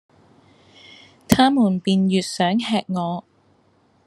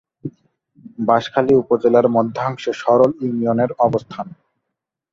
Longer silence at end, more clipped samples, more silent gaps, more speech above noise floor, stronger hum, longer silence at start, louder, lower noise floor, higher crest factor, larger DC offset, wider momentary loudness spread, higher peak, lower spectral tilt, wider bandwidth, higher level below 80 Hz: about the same, 0.85 s vs 0.85 s; neither; neither; second, 40 dB vs 64 dB; neither; first, 1.3 s vs 0.25 s; about the same, -19 LUFS vs -17 LUFS; second, -59 dBFS vs -80 dBFS; about the same, 22 dB vs 18 dB; neither; second, 9 LU vs 17 LU; about the same, 0 dBFS vs -2 dBFS; second, -5.5 dB/octave vs -7.5 dB/octave; first, 12.5 kHz vs 7.6 kHz; first, -52 dBFS vs -58 dBFS